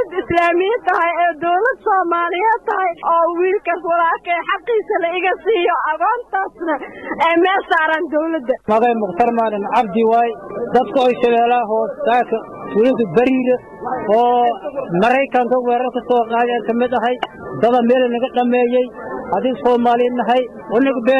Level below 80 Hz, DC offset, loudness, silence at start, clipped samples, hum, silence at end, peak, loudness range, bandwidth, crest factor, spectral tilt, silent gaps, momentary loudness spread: -54 dBFS; under 0.1%; -16 LUFS; 0 s; under 0.1%; none; 0 s; -6 dBFS; 1 LU; 7.6 kHz; 12 dB; -6.5 dB/octave; none; 7 LU